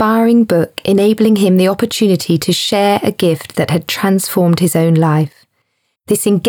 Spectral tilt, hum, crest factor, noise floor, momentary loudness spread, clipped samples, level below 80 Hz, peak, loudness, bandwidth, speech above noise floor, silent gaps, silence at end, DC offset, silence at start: -5.5 dB/octave; none; 12 dB; -66 dBFS; 5 LU; under 0.1%; -54 dBFS; 0 dBFS; -13 LUFS; over 20 kHz; 54 dB; none; 0 s; under 0.1%; 0 s